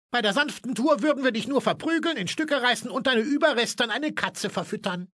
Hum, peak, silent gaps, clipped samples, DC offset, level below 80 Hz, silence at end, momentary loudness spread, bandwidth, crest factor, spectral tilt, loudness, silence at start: none; -6 dBFS; none; under 0.1%; under 0.1%; -72 dBFS; 0.1 s; 6 LU; 11 kHz; 18 dB; -3.5 dB/octave; -25 LUFS; 0.1 s